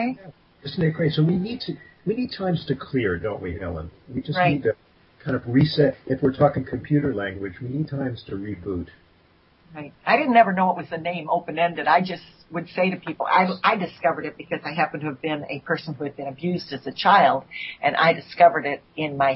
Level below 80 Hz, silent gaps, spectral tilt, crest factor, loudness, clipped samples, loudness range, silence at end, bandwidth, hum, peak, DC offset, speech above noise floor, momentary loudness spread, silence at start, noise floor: -54 dBFS; none; -10 dB/octave; 20 dB; -23 LUFS; under 0.1%; 5 LU; 0 s; 5.8 kHz; none; -2 dBFS; under 0.1%; 35 dB; 15 LU; 0 s; -58 dBFS